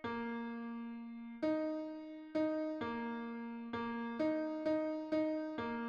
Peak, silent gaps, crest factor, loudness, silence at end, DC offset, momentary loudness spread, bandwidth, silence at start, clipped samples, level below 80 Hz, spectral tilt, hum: -26 dBFS; none; 14 dB; -40 LUFS; 0 s; under 0.1%; 9 LU; 6.6 kHz; 0 s; under 0.1%; -74 dBFS; -7 dB/octave; none